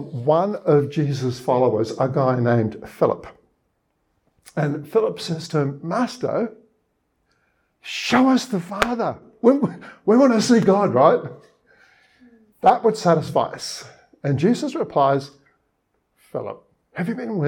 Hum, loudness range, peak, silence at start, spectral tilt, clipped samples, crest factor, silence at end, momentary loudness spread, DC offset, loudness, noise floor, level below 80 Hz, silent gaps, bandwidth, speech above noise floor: none; 7 LU; -2 dBFS; 0 s; -6.5 dB/octave; under 0.1%; 20 dB; 0 s; 15 LU; under 0.1%; -20 LUFS; -70 dBFS; -58 dBFS; none; 17 kHz; 51 dB